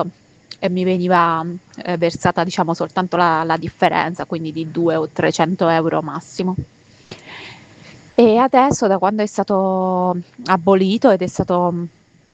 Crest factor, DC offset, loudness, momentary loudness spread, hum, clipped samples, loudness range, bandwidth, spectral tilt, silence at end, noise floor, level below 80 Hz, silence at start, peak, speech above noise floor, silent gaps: 18 dB; under 0.1%; -17 LUFS; 13 LU; none; under 0.1%; 4 LU; 8.6 kHz; -6 dB/octave; 0.45 s; -43 dBFS; -52 dBFS; 0 s; 0 dBFS; 26 dB; none